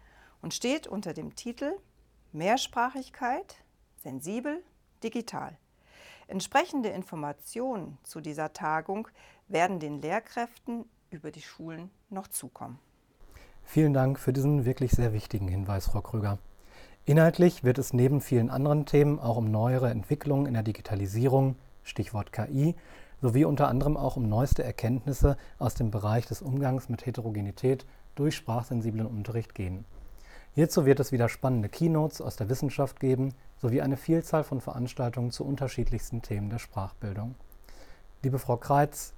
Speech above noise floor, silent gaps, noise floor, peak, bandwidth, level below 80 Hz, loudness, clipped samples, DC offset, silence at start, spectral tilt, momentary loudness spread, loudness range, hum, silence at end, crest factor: 27 dB; none; -56 dBFS; -8 dBFS; 19 kHz; -44 dBFS; -29 LUFS; under 0.1%; under 0.1%; 0.45 s; -7 dB/octave; 15 LU; 8 LU; none; 0 s; 20 dB